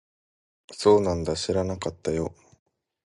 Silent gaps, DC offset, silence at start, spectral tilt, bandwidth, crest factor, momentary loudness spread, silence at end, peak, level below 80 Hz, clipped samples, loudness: none; under 0.1%; 0.7 s; -5.5 dB/octave; 11.5 kHz; 22 dB; 11 LU; 0.75 s; -6 dBFS; -46 dBFS; under 0.1%; -25 LUFS